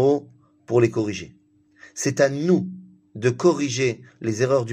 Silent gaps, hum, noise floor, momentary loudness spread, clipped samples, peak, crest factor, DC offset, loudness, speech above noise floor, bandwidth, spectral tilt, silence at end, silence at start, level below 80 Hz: none; none; -52 dBFS; 15 LU; under 0.1%; -4 dBFS; 18 dB; under 0.1%; -22 LUFS; 31 dB; 15 kHz; -5.5 dB/octave; 0 s; 0 s; -62 dBFS